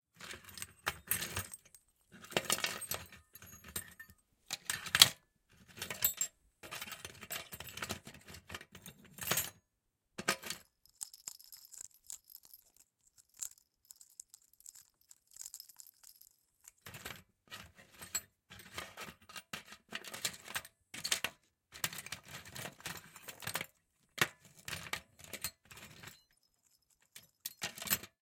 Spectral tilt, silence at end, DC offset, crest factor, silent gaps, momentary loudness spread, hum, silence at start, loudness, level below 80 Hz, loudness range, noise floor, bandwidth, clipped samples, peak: -0.5 dB/octave; 0.15 s; under 0.1%; 40 dB; none; 20 LU; none; 0.15 s; -38 LUFS; -72 dBFS; 19 LU; -84 dBFS; 17 kHz; under 0.1%; -4 dBFS